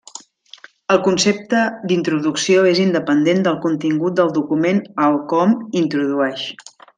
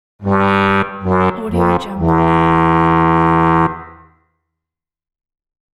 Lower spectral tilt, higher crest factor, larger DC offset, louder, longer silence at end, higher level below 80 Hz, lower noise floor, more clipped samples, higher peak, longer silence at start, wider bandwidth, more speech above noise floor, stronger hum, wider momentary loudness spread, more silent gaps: second, -5 dB/octave vs -8.5 dB/octave; about the same, 16 dB vs 14 dB; neither; second, -17 LUFS vs -14 LUFS; second, 0.35 s vs 1.8 s; second, -64 dBFS vs -36 dBFS; second, -44 dBFS vs -84 dBFS; neither; about the same, -2 dBFS vs 0 dBFS; about the same, 0.15 s vs 0.2 s; about the same, 9.6 kHz vs 8.8 kHz; second, 28 dB vs 70 dB; neither; about the same, 7 LU vs 5 LU; neither